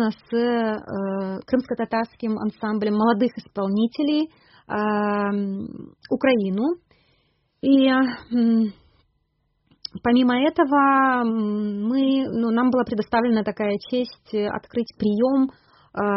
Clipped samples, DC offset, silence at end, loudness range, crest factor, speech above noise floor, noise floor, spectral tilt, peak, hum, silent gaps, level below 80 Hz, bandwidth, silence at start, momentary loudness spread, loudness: under 0.1%; under 0.1%; 0 s; 4 LU; 16 dB; 49 dB; -70 dBFS; -4.5 dB/octave; -6 dBFS; none; none; -60 dBFS; 5.8 kHz; 0 s; 10 LU; -22 LUFS